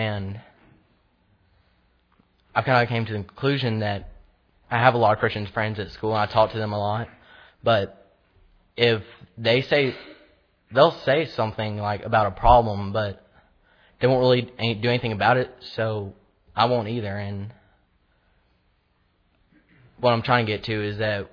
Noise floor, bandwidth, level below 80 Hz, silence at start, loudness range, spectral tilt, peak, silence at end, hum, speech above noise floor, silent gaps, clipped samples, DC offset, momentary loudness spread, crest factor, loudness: -66 dBFS; 5.4 kHz; -44 dBFS; 0 s; 7 LU; -7.5 dB/octave; -2 dBFS; 0.05 s; none; 44 dB; none; under 0.1%; under 0.1%; 13 LU; 24 dB; -23 LUFS